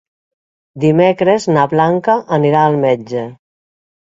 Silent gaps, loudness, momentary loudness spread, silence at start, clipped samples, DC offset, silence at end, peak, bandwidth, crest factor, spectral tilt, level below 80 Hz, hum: none; -13 LUFS; 8 LU; 0.75 s; under 0.1%; under 0.1%; 0.8 s; 0 dBFS; 7.8 kHz; 14 dB; -7 dB/octave; -56 dBFS; none